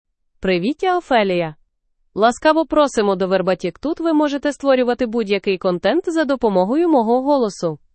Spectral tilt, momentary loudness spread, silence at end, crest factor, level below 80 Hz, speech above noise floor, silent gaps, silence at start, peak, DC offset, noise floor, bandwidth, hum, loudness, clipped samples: -5.5 dB/octave; 6 LU; 0.2 s; 16 dB; -50 dBFS; 48 dB; none; 0.4 s; -2 dBFS; under 0.1%; -65 dBFS; 8.8 kHz; none; -18 LUFS; under 0.1%